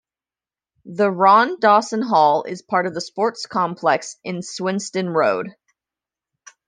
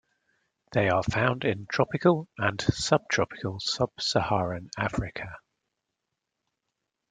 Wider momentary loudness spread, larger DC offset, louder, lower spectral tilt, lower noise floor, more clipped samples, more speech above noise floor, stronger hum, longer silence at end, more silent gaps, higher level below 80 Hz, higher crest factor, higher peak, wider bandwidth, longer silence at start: first, 13 LU vs 7 LU; neither; first, -19 LUFS vs -27 LUFS; about the same, -4.5 dB/octave vs -5 dB/octave; first, under -90 dBFS vs -84 dBFS; neither; first, over 71 dB vs 57 dB; neither; second, 1.2 s vs 1.7 s; neither; second, -72 dBFS vs -52 dBFS; about the same, 18 dB vs 22 dB; first, -2 dBFS vs -6 dBFS; about the same, 10 kHz vs 9.4 kHz; first, 0.85 s vs 0.7 s